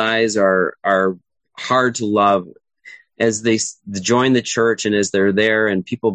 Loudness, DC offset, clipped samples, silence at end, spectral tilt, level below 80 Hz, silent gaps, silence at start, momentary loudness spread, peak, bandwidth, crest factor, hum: -17 LUFS; under 0.1%; under 0.1%; 0 s; -4 dB/octave; -56 dBFS; none; 0 s; 6 LU; -2 dBFS; 9.4 kHz; 16 dB; none